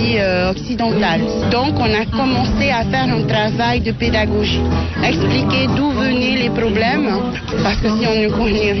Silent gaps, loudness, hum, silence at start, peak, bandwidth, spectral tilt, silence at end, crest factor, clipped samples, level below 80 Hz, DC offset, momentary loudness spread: none; -16 LUFS; none; 0 s; -6 dBFS; 6.2 kHz; -6.5 dB/octave; 0 s; 10 dB; under 0.1%; -30 dBFS; under 0.1%; 3 LU